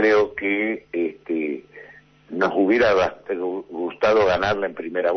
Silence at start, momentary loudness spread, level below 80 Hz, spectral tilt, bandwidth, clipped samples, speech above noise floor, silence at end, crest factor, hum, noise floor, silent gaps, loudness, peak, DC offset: 0 s; 11 LU; -54 dBFS; -5.5 dB/octave; 6.4 kHz; under 0.1%; 28 dB; 0 s; 16 dB; none; -48 dBFS; none; -22 LUFS; -6 dBFS; under 0.1%